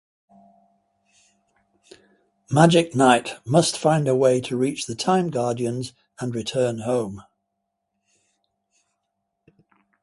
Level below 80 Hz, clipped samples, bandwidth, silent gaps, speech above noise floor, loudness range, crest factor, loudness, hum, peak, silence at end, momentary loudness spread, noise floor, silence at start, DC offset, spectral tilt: -62 dBFS; under 0.1%; 11.5 kHz; none; 58 dB; 10 LU; 24 dB; -21 LUFS; none; 0 dBFS; 2.8 s; 13 LU; -78 dBFS; 2.5 s; under 0.1%; -5.5 dB/octave